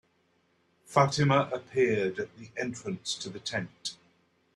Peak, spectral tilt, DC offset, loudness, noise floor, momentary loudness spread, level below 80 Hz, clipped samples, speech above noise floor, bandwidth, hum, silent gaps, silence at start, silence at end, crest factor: -8 dBFS; -5 dB/octave; under 0.1%; -30 LUFS; -70 dBFS; 13 LU; -68 dBFS; under 0.1%; 41 dB; 11.5 kHz; none; none; 0.9 s; 0.6 s; 22 dB